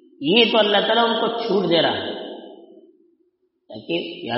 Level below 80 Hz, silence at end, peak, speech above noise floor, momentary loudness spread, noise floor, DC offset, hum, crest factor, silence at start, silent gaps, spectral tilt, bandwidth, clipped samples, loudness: -68 dBFS; 0 s; -2 dBFS; 47 dB; 18 LU; -66 dBFS; under 0.1%; none; 20 dB; 0.2 s; none; -1.5 dB/octave; 6 kHz; under 0.1%; -19 LUFS